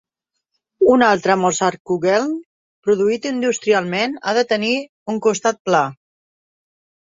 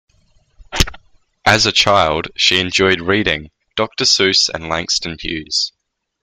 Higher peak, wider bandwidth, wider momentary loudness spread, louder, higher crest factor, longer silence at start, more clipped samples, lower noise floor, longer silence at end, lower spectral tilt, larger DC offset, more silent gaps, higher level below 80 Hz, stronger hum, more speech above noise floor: about the same, -2 dBFS vs 0 dBFS; second, 7.8 kHz vs 15.5 kHz; second, 8 LU vs 12 LU; second, -18 LUFS vs -15 LUFS; about the same, 18 dB vs 18 dB; about the same, 0.8 s vs 0.7 s; neither; first, -79 dBFS vs -56 dBFS; first, 1.1 s vs 0.55 s; first, -4 dB/octave vs -2.5 dB/octave; neither; first, 1.80-1.85 s, 2.46-2.83 s, 4.89-5.06 s, 5.60-5.65 s vs none; second, -60 dBFS vs -34 dBFS; neither; first, 62 dB vs 40 dB